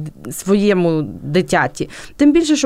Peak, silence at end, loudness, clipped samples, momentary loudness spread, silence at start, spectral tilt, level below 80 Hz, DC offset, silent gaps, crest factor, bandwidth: -2 dBFS; 0 s; -16 LUFS; under 0.1%; 14 LU; 0 s; -5.5 dB/octave; -44 dBFS; under 0.1%; none; 12 dB; 15.5 kHz